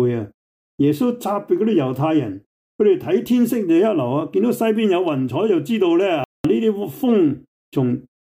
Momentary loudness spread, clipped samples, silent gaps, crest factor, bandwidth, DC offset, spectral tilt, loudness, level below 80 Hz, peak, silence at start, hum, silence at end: 6 LU; under 0.1%; 0.34-0.78 s, 2.46-2.79 s, 6.25-6.44 s, 7.48-7.72 s; 12 dB; 16 kHz; under 0.1%; -7.5 dB/octave; -19 LUFS; -58 dBFS; -6 dBFS; 0 s; none; 0.25 s